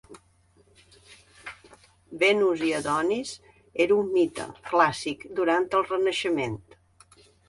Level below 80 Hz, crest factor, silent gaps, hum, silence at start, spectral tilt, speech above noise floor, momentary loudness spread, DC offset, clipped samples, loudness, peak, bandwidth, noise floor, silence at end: -62 dBFS; 22 dB; none; none; 0.1 s; -4.5 dB/octave; 37 dB; 20 LU; under 0.1%; under 0.1%; -25 LUFS; -6 dBFS; 11.5 kHz; -62 dBFS; 0.9 s